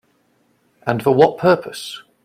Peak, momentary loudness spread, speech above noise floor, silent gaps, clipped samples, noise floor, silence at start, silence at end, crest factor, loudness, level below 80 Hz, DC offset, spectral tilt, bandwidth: 0 dBFS; 16 LU; 45 dB; none; under 0.1%; -61 dBFS; 0.85 s; 0.25 s; 18 dB; -16 LUFS; -58 dBFS; under 0.1%; -6 dB/octave; 16 kHz